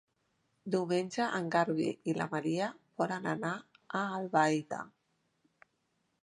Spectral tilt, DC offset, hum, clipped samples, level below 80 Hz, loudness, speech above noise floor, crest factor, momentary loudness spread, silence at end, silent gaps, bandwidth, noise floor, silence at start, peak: -5.5 dB/octave; under 0.1%; none; under 0.1%; -82 dBFS; -34 LUFS; 46 dB; 20 dB; 11 LU; 1.35 s; none; 11 kHz; -79 dBFS; 0.65 s; -14 dBFS